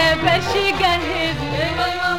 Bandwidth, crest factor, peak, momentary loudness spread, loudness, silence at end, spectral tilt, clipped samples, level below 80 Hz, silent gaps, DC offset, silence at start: 16.5 kHz; 14 dB; -4 dBFS; 5 LU; -18 LUFS; 0 s; -4.5 dB/octave; under 0.1%; -36 dBFS; none; 1%; 0 s